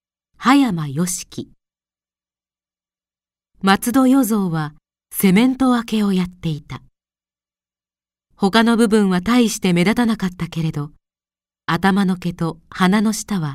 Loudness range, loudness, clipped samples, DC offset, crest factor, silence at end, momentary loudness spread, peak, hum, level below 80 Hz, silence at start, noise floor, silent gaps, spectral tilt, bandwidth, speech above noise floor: 5 LU; -18 LUFS; under 0.1%; under 0.1%; 18 dB; 0 s; 13 LU; 0 dBFS; none; -48 dBFS; 0.4 s; under -90 dBFS; none; -5.5 dB/octave; 16 kHz; over 73 dB